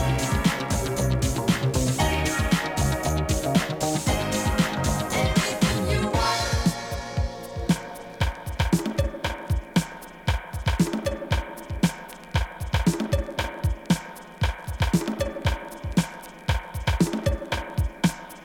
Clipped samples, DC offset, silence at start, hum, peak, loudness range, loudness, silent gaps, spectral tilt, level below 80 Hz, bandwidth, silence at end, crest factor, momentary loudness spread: under 0.1%; under 0.1%; 0 s; none; -8 dBFS; 4 LU; -26 LUFS; none; -5 dB/octave; -32 dBFS; 18 kHz; 0 s; 18 dB; 7 LU